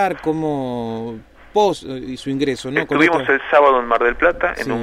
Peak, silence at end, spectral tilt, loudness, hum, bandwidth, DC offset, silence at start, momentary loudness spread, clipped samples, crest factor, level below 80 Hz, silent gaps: -2 dBFS; 0 s; -5.5 dB/octave; -18 LUFS; none; 14.5 kHz; under 0.1%; 0 s; 14 LU; under 0.1%; 16 dB; -44 dBFS; none